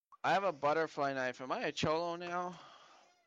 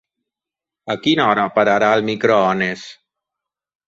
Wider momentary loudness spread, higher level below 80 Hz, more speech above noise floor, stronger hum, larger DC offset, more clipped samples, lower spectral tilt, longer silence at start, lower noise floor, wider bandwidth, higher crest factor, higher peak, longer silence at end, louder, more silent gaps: second, 7 LU vs 15 LU; second, -74 dBFS vs -60 dBFS; second, 28 dB vs 71 dB; neither; neither; neither; about the same, -4.5 dB/octave vs -5.5 dB/octave; second, 0.1 s vs 0.85 s; second, -63 dBFS vs -87 dBFS; first, 8.6 kHz vs 7.8 kHz; about the same, 16 dB vs 18 dB; second, -20 dBFS vs -2 dBFS; second, 0.5 s vs 0.95 s; second, -36 LUFS vs -16 LUFS; neither